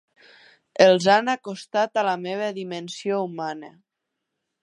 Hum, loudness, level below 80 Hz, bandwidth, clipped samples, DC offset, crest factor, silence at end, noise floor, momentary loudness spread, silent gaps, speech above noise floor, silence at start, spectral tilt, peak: none; -22 LUFS; -74 dBFS; 11 kHz; under 0.1%; under 0.1%; 22 dB; 0.95 s; -82 dBFS; 15 LU; none; 60 dB; 0.75 s; -4.5 dB/octave; -2 dBFS